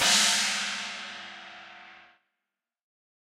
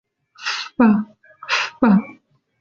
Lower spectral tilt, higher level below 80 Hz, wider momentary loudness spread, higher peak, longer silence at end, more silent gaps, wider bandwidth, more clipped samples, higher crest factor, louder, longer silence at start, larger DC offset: second, 1 dB/octave vs -5.5 dB/octave; second, -76 dBFS vs -58 dBFS; first, 25 LU vs 19 LU; second, -8 dBFS vs -4 dBFS; first, 1.25 s vs 0.5 s; neither; first, 16 kHz vs 7.6 kHz; neither; first, 24 dB vs 18 dB; second, -25 LUFS vs -19 LUFS; second, 0 s vs 0.4 s; neither